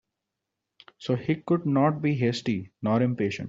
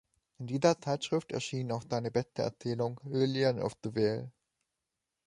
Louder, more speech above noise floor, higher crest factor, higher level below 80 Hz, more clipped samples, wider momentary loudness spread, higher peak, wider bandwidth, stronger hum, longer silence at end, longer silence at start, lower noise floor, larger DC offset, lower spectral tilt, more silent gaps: first, -26 LUFS vs -33 LUFS; first, 59 dB vs 55 dB; about the same, 18 dB vs 22 dB; about the same, -64 dBFS vs -68 dBFS; neither; about the same, 7 LU vs 8 LU; first, -8 dBFS vs -12 dBFS; second, 7.8 kHz vs 11.5 kHz; neither; second, 0 s vs 1 s; first, 1 s vs 0.4 s; about the same, -85 dBFS vs -87 dBFS; neither; first, -7.5 dB/octave vs -6 dB/octave; neither